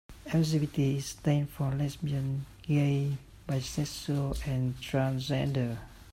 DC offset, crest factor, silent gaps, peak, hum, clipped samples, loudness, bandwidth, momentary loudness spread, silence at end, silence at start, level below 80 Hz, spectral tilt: under 0.1%; 16 dB; none; -14 dBFS; none; under 0.1%; -31 LUFS; 15.5 kHz; 7 LU; 0 s; 0.1 s; -50 dBFS; -6.5 dB/octave